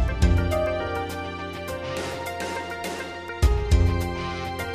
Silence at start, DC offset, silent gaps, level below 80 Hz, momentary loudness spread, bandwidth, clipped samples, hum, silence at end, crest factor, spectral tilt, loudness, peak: 0 s; under 0.1%; none; -28 dBFS; 10 LU; 15.5 kHz; under 0.1%; none; 0 s; 18 dB; -6 dB/octave; -26 LUFS; -8 dBFS